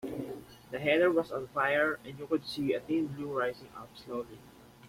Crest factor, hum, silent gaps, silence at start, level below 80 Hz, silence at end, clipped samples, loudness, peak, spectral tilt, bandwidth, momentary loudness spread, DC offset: 20 dB; none; none; 0.05 s; -66 dBFS; 0 s; under 0.1%; -32 LUFS; -14 dBFS; -6 dB/octave; 16.5 kHz; 19 LU; under 0.1%